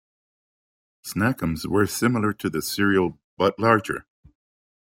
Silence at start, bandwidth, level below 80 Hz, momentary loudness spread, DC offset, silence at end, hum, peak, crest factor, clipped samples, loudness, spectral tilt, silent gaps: 1.05 s; 16.5 kHz; -54 dBFS; 11 LU; under 0.1%; 0.95 s; none; -4 dBFS; 20 dB; under 0.1%; -23 LUFS; -5.5 dB/octave; 3.24-3.37 s